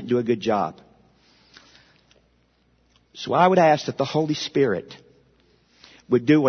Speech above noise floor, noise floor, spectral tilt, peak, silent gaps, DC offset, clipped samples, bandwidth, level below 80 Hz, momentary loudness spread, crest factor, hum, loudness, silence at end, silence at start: 43 dB; -63 dBFS; -6 dB/octave; -4 dBFS; none; under 0.1%; under 0.1%; 6.6 kHz; -64 dBFS; 13 LU; 20 dB; none; -21 LUFS; 0 s; 0 s